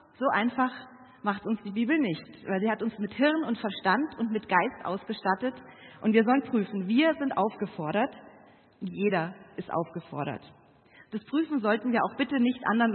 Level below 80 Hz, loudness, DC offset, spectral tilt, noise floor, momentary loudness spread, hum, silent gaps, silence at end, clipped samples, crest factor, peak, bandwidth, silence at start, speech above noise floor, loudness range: -72 dBFS; -28 LUFS; under 0.1%; -10 dB/octave; -57 dBFS; 11 LU; none; none; 0 s; under 0.1%; 20 dB; -8 dBFS; 4.4 kHz; 0.2 s; 29 dB; 5 LU